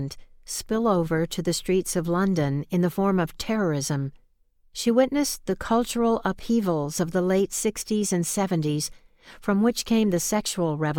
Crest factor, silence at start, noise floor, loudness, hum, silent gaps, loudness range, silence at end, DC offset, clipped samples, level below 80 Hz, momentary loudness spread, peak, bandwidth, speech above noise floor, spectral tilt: 18 dB; 0 s; -61 dBFS; -25 LUFS; none; none; 1 LU; 0 s; under 0.1%; under 0.1%; -48 dBFS; 7 LU; -6 dBFS; 18.5 kHz; 37 dB; -5 dB/octave